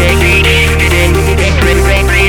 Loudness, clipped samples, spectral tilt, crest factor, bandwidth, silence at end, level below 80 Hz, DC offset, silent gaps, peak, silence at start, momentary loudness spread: -8 LUFS; under 0.1%; -4.5 dB/octave; 8 dB; 18 kHz; 0 s; -12 dBFS; under 0.1%; none; 0 dBFS; 0 s; 3 LU